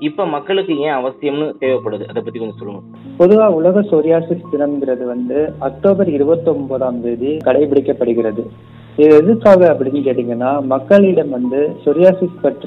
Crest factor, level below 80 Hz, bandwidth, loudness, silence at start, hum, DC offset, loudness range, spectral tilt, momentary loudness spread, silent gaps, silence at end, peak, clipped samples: 14 dB; -52 dBFS; 6 kHz; -14 LUFS; 0 s; none; under 0.1%; 4 LU; -9 dB/octave; 14 LU; none; 0 s; 0 dBFS; under 0.1%